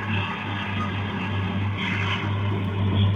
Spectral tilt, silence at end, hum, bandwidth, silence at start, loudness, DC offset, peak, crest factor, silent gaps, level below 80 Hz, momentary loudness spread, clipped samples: -7 dB/octave; 0 s; none; 7 kHz; 0 s; -26 LUFS; under 0.1%; -12 dBFS; 14 dB; none; -50 dBFS; 3 LU; under 0.1%